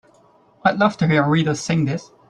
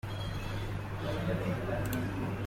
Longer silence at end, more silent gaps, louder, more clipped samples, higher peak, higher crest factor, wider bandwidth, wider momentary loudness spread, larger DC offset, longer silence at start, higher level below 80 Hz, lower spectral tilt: first, 0.25 s vs 0 s; neither; first, -19 LUFS vs -36 LUFS; neither; first, -2 dBFS vs -20 dBFS; about the same, 18 dB vs 14 dB; second, 9.8 kHz vs 16.5 kHz; about the same, 5 LU vs 4 LU; neither; first, 0.65 s vs 0.05 s; second, -56 dBFS vs -46 dBFS; about the same, -6 dB/octave vs -6.5 dB/octave